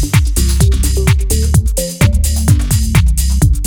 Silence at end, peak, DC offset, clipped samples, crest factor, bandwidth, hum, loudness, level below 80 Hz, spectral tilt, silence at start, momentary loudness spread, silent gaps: 0 s; 0 dBFS; under 0.1%; under 0.1%; 10 dB; 20 kHz; none; -13 LUFS; -14 dBFS; -5 dB/octave; 0 s; 1 LU; none